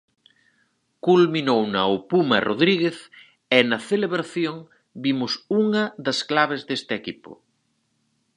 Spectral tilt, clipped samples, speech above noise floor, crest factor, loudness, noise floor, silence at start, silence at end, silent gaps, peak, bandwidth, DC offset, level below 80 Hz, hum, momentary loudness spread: -5.5 dB/octave; under 0.1%; 48 dB; 22 dB; -22 LUFS; -70 dBFS; 1.05 s; 1 s; none; 0 dBFS; 11 kHz; under 0.1%; -68 dBFS; none; 10 LU